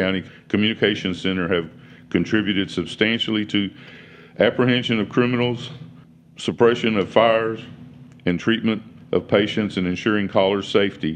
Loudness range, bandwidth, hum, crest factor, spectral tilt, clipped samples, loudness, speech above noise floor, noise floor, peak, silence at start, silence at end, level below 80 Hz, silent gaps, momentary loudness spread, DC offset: 2 LU; 9.6 kHz; none; 20 dB; -6 dB/octave; under 0.1%; -21 LUFS; 26 dB; -47 dBFS; 0 dBFS; 0 s; 0 s; -56 dBFS; none; 11 LU; under 0.1%